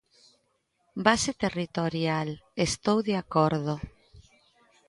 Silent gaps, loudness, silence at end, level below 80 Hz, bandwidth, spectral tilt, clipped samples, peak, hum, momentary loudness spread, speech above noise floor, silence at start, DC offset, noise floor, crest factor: none; -27 LUFS; 0.7 s; -54 dBFS; 11.5 kHz; -4.5 dB/octave; under 0.1%; -6 dBFS; none; 10 LU; 46 dB; 0.95 s; under 0.1%; -73 dBFS; 24 dB